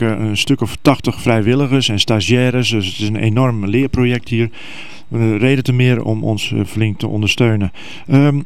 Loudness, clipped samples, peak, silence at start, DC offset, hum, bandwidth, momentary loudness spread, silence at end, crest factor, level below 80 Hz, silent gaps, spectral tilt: -15 LUFS; under 0.1%; 0 dBFS; 0 s; 3%; none; 13.5 kHz; 6 LU; 0 s; 16 dB; -40 dBFS; none; -6 dB/octave